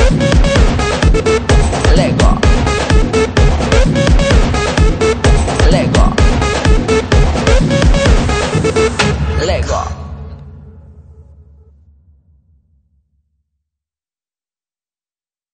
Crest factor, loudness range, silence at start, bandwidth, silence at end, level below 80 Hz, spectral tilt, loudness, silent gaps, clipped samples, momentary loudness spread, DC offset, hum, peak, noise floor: 12 dB; 7 LU; 0 s; 9.4 kHz; 4.55 s; -16 dBFS; -5.5 dB/octave; -12 LUFS; none; under 0.1%; 4 LU; under 0.1%; none; 0 dBFS; under -90 dBFS